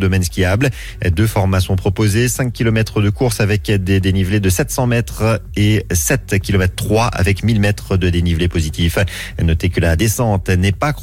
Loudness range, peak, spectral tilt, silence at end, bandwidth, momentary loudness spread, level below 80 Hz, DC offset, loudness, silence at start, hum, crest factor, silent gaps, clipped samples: 1 LU; -4 dBFS; -5.5 dB/octave; 0 s; 16.5 kHz; 3 LU; -28 dBFS; under 0.1%; -16 LUFS; 0 s; none; 12 dB; none; under 0.1%